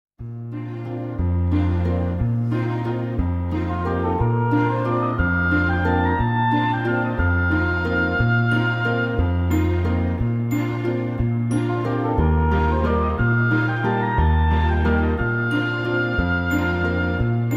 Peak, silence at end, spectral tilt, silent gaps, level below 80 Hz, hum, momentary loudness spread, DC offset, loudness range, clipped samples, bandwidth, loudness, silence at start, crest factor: -6 dBFS; 0 s; -8.5 dB/octave; none; -30 dBFS; none; 5 LU; under 0.1%; 3 LU; under 0.1%; 14.5 kHz; -21 LUFS; 0.2 s; 14 dB